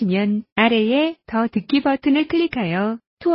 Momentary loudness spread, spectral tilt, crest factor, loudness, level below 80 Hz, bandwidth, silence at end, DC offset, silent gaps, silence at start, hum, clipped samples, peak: 6 LU; -11 dB/octave; 16 dB; -20 LUFS; -54 dBFS; 5.8 kHz; 0 s; under 0.1%; 0.52-0.56 s, 3.07-3.17 s; 0 s; none; under 0.1%; -4 dBFS